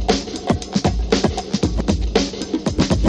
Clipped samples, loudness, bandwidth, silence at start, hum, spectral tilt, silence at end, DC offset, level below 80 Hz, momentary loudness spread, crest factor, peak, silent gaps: under 0.1%; -20 LUFS; 10.5 kHz; 0 s; none; -5.5 dB/octave; 0 s; under 0.1%; -26 dBFS; 4 LU; 16 dB; -2 dBFS; none